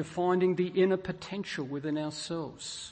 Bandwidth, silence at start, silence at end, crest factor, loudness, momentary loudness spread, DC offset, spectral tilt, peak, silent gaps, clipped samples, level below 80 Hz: 8.8 kHz; 0 s; 0 s; 16 dB; -31 LUFS; 10 LU; under 0.1%; -5.5 dB/octave; -16 dBFS; none; under 0.1%; -64 dBFS